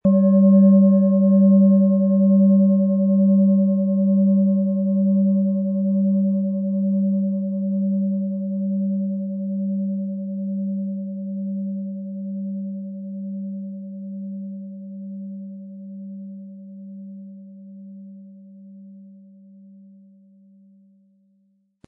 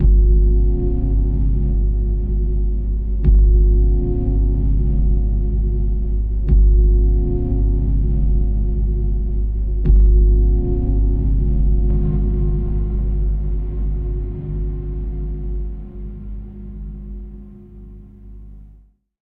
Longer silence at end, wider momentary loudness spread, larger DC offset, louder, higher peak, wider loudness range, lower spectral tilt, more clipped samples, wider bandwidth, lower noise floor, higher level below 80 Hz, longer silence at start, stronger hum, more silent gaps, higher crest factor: first, 2.8 s vs 0.55 s; first, 22 LU vs 17 LU; second, under 0.1% vs 0.7%; about the same, -19 LUFS vs -19 LUFS; second, -6 dBFS vs -2 dBFS; first, 22 LU vs 11 LU; first, -16.5 dB/octave vs -13.5 dB/octave; neither; about the same, 1.1 kHz vs 1.1 kHz; first, -64 dBFS vs -48 dBFS; second, -70 dBFS vs -16 dBFS; about the same, 0.05 s vs 0 s; second, none vs 50 Hz at -20 dBFS; neither; about the same, 14 dB vs 14 dB